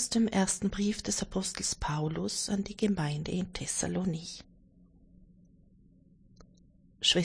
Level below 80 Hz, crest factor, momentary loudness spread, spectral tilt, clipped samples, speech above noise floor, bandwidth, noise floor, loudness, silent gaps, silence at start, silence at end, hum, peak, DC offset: -52 dBFS; 20 dB; 7 LU; -3.5 dB/octave; under 0.1%; 29 dB; 10.5 kHz; -61 dBFS; -31 LUFS; none; 0 s; 0 s; none; -12 dBFS; under 0.1%